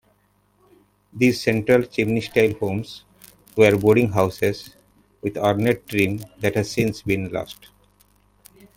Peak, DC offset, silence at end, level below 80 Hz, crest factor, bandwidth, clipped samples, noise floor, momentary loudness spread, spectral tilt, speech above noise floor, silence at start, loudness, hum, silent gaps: -2 dBFS; under 0.1%; 1.25 s; -52 dBFS; 20 dB; 17 kHz; under 0.1%; -63 dBFS; 14 LU; -6 dB/octave; 42 dB; 1.15 s; -21 LUFS; 50 Hz at -45 dBFS; none